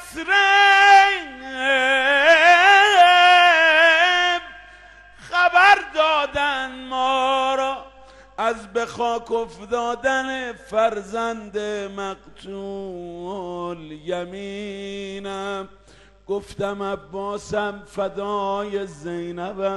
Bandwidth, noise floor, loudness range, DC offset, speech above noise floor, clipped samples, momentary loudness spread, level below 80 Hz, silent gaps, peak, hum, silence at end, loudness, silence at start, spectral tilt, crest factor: 12.5 kHz; -50 dBFS; 17 LU; under 0.1%; 24 dB; under 0.1%; 19 LU; -54 dBFS; none; -2 dBFS; none; 0 s; -17 LUFS; 0 s; -2.5 dB/octave; 18 dB